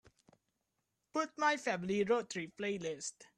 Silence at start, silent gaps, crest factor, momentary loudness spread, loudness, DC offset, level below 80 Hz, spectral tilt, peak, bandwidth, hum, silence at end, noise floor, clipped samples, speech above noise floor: 1.15 s; none; 20 dB; 8 LU; -36 LUFS; under 0.1%; -76 dBFS; -4 dB/octave; -18 dBFS; 11.5 kHz; none; 0.15 s; -85 dBFS; under 0.1%; 49 dB